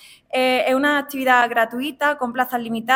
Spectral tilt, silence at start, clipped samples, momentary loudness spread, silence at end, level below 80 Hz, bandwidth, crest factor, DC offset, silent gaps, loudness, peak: -3 dB/octave; 0.35 s; under 0.1%; 7 LU; 0 s; -66 dBFS; 17.5 kHz; 16 dB; under 0.1%; none; -19 LUFS; -2 dBFS